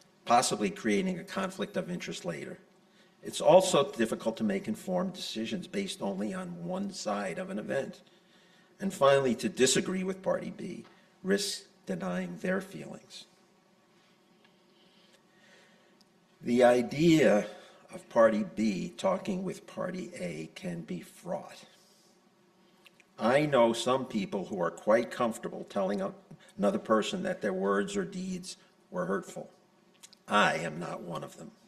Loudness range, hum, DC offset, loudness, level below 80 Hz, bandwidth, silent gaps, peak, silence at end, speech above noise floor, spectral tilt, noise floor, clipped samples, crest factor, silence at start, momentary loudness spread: 9 LU; none; under 0.1%; -30 LUFS; -68 dBFS; 14 kHz; none; -8 dBFS; 0.2 s; 35 dB; -4.5 dB/octave; -65 dBFS; under 0.1%; 24 dB; 0.25 s; 17 LU